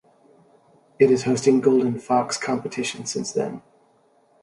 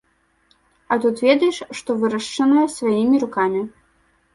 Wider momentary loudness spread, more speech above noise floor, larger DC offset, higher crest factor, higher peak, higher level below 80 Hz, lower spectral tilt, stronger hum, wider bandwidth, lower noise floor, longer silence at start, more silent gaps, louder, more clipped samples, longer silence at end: about the same, 10 LU vs 9 LU; second, 39 dB vs 43 dB; neither; about the same, 20 dB vs 18 dB; about the same, -4 dBFS vs -2 dBFS; about the same, -66 dBFS vs -62 dBFS; about the same, -5 dB/octave vs -5 dB/octave; neither; about the same, 11.5 kHz vs 11.5 kHz; about the same, -60 dBFS vs -61 dBFS; about the same, 1 s vs 0.9 s; neither; second, -22 LUFS vs -19 LUFS; neither; first, 0.85 s vs 0.65 s